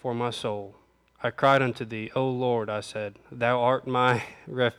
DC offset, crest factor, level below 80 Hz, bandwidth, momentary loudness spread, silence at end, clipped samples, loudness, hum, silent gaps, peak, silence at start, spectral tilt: under 0.1%; 18 dB; -66 dBFS; 12.5 kHz; 13 LU; 0.05 s; under 0.1%; -26 LUFS; none; none; -8 dBFS; 0.05 s; -6 dB/octave